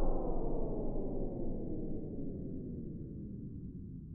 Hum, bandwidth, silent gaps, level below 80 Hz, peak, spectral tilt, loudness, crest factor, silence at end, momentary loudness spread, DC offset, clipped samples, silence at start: none; 1.5 kHz; none; -40 dBFS; -22 dBFS; -12 dB/octave; -42 LUFS; 14 dB; 0 s; 7 LU; under 0.1%; under 0.1%; 0 s